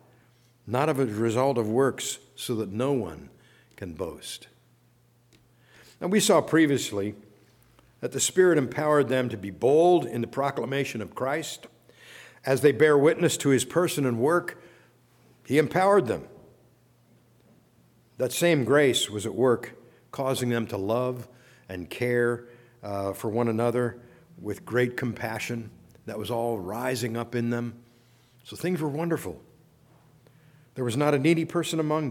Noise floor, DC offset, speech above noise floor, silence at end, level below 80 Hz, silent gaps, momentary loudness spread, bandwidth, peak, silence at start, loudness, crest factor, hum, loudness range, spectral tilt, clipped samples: -62 dBFS; under 0.1%; 37 dB; 0 s; -66 dBFS; none; 17 LU; 18 kHz; -8 dBFS; 0.65 s; -26 LUFS; 20 dB; none; 8 LU; -5 dB/octave; under 0.1%